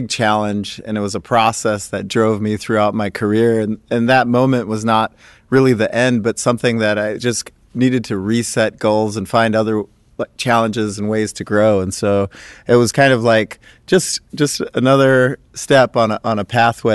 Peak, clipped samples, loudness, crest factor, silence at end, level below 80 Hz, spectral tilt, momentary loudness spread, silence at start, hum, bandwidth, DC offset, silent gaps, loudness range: -2 dBFS; under 0.1%; -16 LUFS; 14 dB; 0 s; -48 dBFS; -5 dB/octave; 9 LU; 0 s; none; 12.5 kHz; under 0.1%; none; 3 LU